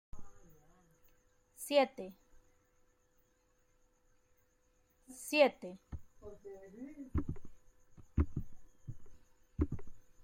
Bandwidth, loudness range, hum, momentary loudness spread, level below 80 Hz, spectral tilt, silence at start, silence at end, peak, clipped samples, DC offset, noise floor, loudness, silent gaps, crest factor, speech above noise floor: 16.5 kHz; 6 LU; none; 23 LU; -52 dBFS; -5.5 dB/octave; 0.15 s; 0 s; -16 dBFS; under 0.1%; under 0.1%; -73 dBFS; -36 LUFS; none; 24 dB; 38 dB